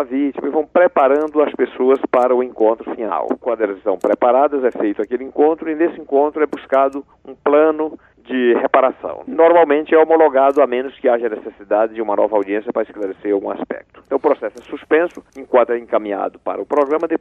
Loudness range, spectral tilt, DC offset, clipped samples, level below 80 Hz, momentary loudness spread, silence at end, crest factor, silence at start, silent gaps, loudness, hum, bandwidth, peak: 5 LU; -6.5 dB/octave; under 0.1%; under 0.1%; -60 dBFS; 11 LU; 0.05 s; 16 dB; 0 s; none; -17 LUFS; none; 6.6 kHz; -2 dBFS